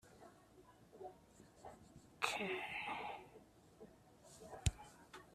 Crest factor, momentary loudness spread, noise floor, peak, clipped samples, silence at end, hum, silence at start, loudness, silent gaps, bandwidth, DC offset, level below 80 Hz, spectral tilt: 30 dB; 23 LU; -66 dBFS; -20 dBFS; under 0.1%; 0 s; none; 0.05 s; -45 LUFS; none; 14 kHz; under 0.1%; -60 dBFS; -3.5 dB/octave